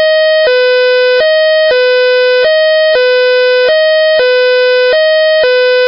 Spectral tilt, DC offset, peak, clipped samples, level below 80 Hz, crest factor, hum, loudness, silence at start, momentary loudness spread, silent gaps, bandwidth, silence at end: -4 dB/octave; under 0.1%; -2 dBFS; under 0.1%; -56 dBFS; 4 dB; none; -8 LUFS; 0 s; 0 LU; none; 5.8 kHz; 0 s